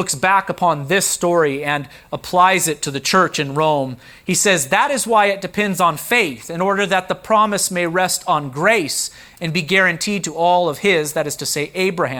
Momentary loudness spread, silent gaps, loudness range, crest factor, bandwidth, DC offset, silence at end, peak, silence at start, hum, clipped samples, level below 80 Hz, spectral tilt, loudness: 7 LU; none; 1 LU; 16 dB; over 20 kHz; under 0.1%; 0 s; -2 dBFS; 0 s; none; under 0.1%; -54 dBFS; -3 dB/octave; -17 LUFS